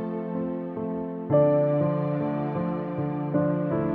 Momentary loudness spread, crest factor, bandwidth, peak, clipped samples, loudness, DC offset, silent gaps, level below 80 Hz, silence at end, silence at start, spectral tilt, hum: 10 LU; 16 dB; 4.4 kHz; -10 dBFS; under 0.1%; -26 LUFS; under 0.1%; none; -58 dBFS; 0 s; 0 s; -12 dB/octave; none